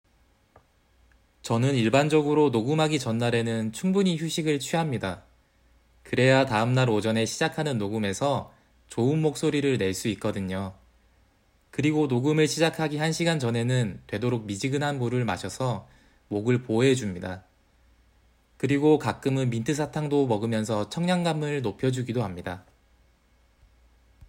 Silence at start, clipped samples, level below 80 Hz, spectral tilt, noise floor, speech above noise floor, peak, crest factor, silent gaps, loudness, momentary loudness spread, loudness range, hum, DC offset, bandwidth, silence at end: 1.45 s; under 0.1%; -60 dBFS; -6 dB/octave; -64 dBFS; 39 dB; -6 dBFS; 20 dB; none; -26 LUFS; 10 LU; 4 LU; none; under 0.1%; 16 kHz; 0.05 s